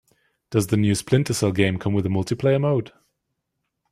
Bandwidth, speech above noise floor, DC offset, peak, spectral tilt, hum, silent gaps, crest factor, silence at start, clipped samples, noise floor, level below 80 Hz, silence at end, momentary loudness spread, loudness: 15 kHz; 57 dB; under 0.1%; -4 dBFS; -6 dB/octave; none; none; 18 dB; 0.5 s; under 0.1%; -78 dBFS; -54 dBFS; 1.05 s; 5 LU; -22 LUFS